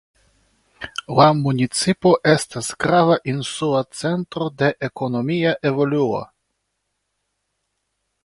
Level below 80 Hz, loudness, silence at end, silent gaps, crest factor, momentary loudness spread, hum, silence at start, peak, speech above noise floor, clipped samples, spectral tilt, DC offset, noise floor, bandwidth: -56 dBFS; -19 LUFS; 2 s; none; 20 dB; 11 LU; none; 0.8 s; 0 dBFS; 56 dB; under 0.1%; -5.5 dB/octave; under 0.1%; -75 dBFS; 11.5 kHz